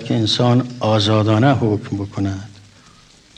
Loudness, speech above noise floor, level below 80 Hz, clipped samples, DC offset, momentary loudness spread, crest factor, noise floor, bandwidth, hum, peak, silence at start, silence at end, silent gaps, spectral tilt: -17 LUFS; 31 dB; -54 dBFS; under 0.1%; under 0.1%; 10 LU; 16 dB; -48 dBFS; 9.4 kHz; none; -2 dBFS; 0 s; 0.9 s; none; -6.5 dB/octave